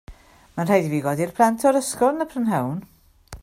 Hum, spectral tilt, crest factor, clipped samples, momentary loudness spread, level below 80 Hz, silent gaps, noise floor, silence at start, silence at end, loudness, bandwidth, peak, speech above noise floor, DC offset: none; -6 dB/octave; 18 dB; under 0.1%; 10 LU; -52 dBFS; none; -44 dBFS; 0.1 s; 0.05 s; -21 LUFS; 16 kHz; -4 dBFS; 23 dB; under 0.1%